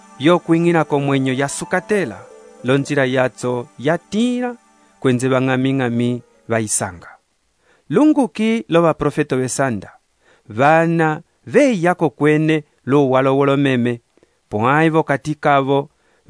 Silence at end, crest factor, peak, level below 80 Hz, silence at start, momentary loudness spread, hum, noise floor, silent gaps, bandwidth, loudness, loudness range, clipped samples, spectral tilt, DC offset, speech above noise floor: 0.45 s; 18 dB; 0 dBFS; -54 dBFS; 0.2 s; 9 LU; none; -63 dBFS; none; 11 kHz; -17 LUFS; 4 LU; under 0.1%; -6 dB/octave; under 0.1%; 47 dB